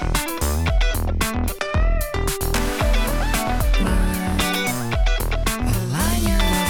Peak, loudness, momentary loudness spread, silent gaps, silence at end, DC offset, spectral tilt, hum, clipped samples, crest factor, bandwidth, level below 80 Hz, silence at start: -8 dBFS; -22 LUFS; 3 LU; none; 0 s; under 0.1%; -4.5 dB/octave; none; under 0.1%; 12 dB; 19.5 kHz; -22 dBFS; 0 s